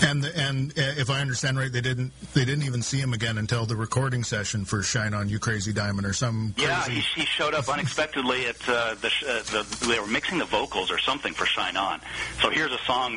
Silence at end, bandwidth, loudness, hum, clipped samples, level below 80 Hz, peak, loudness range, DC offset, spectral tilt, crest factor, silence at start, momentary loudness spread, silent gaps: 0 s; 10.5 kHz; -26 LUFS; none; under 0.1%; -50 dBFS; -4 dBFS; 2 LU; under 0.1%; -4 dB/octave; 22 dB; 0 s; 3 LU; none